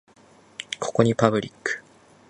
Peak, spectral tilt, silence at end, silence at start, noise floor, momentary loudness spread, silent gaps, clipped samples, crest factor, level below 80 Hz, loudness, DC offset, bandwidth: 0 dBFS; -5.5 dB/octave; 0.5 s; 0.6 s; -54 dBFS; 17 LU; none; under 0.1%; 24 dB; -60 dBFS; -24 LUFS; under 0.1%; 11 kHz